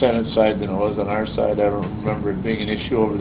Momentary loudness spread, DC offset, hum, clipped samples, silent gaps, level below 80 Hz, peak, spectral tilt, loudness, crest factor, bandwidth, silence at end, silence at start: 5 LU; under 0.1%; none; under 0.1%; none; -40 dBFS; -4 dBFS; -11 dB/octave; -21 LUFS; 16 dB; 4 kHz; 0 s; 0 s